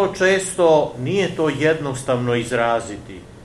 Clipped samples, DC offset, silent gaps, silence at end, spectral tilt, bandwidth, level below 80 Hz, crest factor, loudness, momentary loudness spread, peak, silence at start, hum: under 0.1%; under 0.1%; none; 0 s; -5 dB/octave; 12.5 kHz; -48 dBFS; 16 dB; -19 LUFS; 8 LU; -4 dBFS; 0 s; none